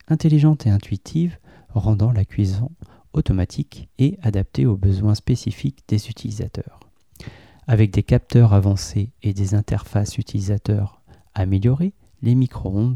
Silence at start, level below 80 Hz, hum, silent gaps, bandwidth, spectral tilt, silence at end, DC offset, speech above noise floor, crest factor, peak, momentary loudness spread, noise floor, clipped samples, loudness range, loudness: 0.1 s; -38 dBFS; none; none; 10.5 kHz; -8 dB/octave; 0 s; 0.2%; 22 dB; 16 dB; -4 dBFS; 14 LU; -41 dBFS; under 0.1%; 4 LU; -20 LUFS